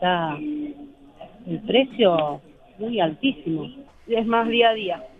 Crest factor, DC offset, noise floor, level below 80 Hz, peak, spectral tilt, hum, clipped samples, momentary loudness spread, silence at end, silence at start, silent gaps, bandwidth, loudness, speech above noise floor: 18 dB; under 0.1%; -45 dBFS; -56 dBFS; -6 dBFS; -7.5 dB/octave; none; under 0.1%; 16 LU; 0.15 s; 0 s; none; 4.7 kHz; -22 LUFS; 23 dB